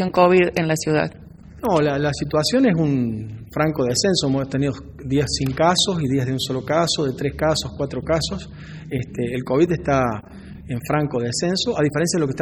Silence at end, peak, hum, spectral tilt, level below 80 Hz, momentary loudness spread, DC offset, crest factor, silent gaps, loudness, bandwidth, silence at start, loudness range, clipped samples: 0 s; -2 dBFS; none; -5 dB/octave; -42 dBFS; 11 LU; under 0.1%; 20 dB; none; -20 LUFS; 20 kHz; 0 s; 3 LU; under 0.1%